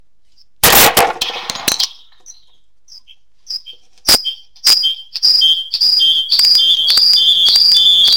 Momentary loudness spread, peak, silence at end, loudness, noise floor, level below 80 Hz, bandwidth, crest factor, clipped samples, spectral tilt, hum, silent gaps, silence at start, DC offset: 13 LU; 0 dBFS; 0 s; -9 LUFS; -57 dBFS; -42 dBFS; 17 kHz; 14 dB; under 0.1%; 0.5 dB/octave; none; none; 0.65 s; 0.9%